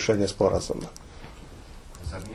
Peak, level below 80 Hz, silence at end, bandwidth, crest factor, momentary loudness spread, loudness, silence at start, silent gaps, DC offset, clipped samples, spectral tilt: -8 dBFS; -44 dBFS; 0 s; 13 kHz; 20 dB; 23 LU; -27 LUFS; 0 s; none; under 0.1%; under 0.1%; -5 dB/octave